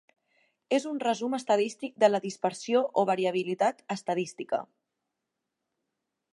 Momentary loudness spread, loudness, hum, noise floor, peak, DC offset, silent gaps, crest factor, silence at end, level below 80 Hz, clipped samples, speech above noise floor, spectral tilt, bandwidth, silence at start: 8 LU; -29 LUFS; none; -85 dBFS; -10 dBFS; under 0.1%; none; 20 dB; 1.7 s; -84 dBFS; under 0.1%; 57 dB; -4.5 dB/octave; 11.5 kHz; 0.7 s